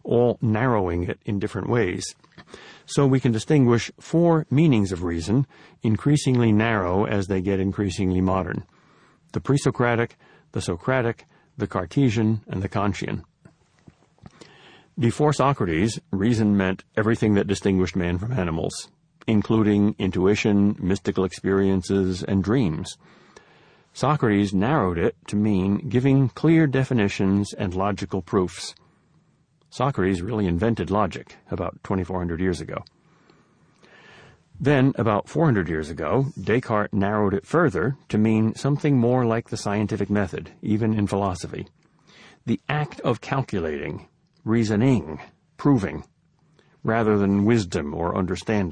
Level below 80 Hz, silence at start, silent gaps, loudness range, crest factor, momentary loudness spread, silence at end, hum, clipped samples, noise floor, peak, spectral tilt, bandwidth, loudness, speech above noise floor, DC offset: -48 dBFS; 0.05 s; none; 5 LU; 18 dB; 11 LU; 0 s; none; under 0.1%; -63 dBFS; -6 dBFS; -7 dB/octave; 10.5 kHz; -23 LUFS; 41 dB; under 0.1%